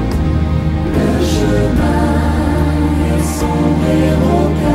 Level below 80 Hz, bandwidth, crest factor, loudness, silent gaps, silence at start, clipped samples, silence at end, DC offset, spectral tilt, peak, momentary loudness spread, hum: -20 dBFS; 15.5 kHz; 12 dB; -14 LUFS; none; 0 s; under 0.1%; 0 s; under 0.1%; -7 dB/octave; -2 dBFS; 3 LU; none